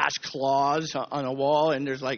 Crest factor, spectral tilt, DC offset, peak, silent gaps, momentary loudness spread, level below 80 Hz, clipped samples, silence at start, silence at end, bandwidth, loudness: 18 dB; -3 dB/octave; under 0.1%; -6 dBFS; none; 7 LU; -66 dBFS; under 0.1%; 0 s; 0 s; 6.8 kHz; -26 LUFS